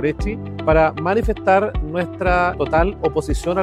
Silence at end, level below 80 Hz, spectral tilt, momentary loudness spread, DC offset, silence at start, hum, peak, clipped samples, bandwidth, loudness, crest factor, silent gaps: 0 s; -28 dBFS; -7 dB/octave; 8 LU; under 0.1%; 0 s; none; -2 dBFS; under 0.1%; 12.5 kHz; -19 LUFS; 16 dB; none